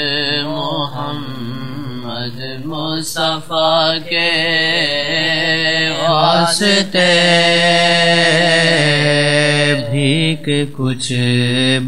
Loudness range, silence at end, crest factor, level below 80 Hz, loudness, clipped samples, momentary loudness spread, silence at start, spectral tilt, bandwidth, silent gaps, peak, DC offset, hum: 8 LU; 0 s; 14 dB; -56 dBFS; -13 LUFS; under 0.1%; 13 LU; 0 s; -4 dB/octave; 16 kHz; none; 0 dBFS; 3%; none